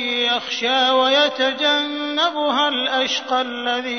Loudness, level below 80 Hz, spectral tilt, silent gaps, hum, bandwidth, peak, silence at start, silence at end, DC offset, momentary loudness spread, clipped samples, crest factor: -18 LUFS; -74 dBFS; -1 dB/octave; none; none; 6.6 kHz; -6 dBFS; 0 s; 0 s; 0.1%; 6 LU; under 0.1%; 14 dB